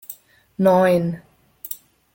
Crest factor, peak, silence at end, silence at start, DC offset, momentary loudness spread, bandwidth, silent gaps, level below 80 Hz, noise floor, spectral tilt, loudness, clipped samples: 18 dB; -4 dBFS; 0.4 s; 0.1 s; under 0.1%; 23 LU; 17 kHz; none; -60 dBFS; -42 dBFS; -7 dB/octave; -18 LUFS; under 0.1%